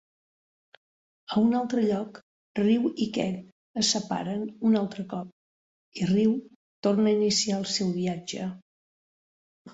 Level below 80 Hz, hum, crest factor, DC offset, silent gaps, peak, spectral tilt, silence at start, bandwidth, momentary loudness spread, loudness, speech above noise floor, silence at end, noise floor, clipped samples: -66 dBFS; none; 16 dB; under 0.1%; 2.22-2.55 s, 3.52-3.74 s, 5.32-5.92 s, 6.55-6.83 s, 8.62-9.65 s; -12 dBFS; -5 dB/octave; 1.3 s; 8 kHz; 13 LU; -27 LUFS; over 64 dB; 0 s; under -90 dBFS; under 0.1%